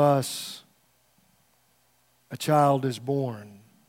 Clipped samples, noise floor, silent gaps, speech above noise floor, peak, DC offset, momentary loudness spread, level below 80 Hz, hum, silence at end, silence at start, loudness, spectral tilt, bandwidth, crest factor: under 0.1%; -66 dBFS; none; 42 dB; -8 dBFS; under 0.1%; 21 LU; -78 dBFS; none; 0.35 s; 0 s; -26 LUFS; -6 dB/octave; 16.5 kHz; 20 dB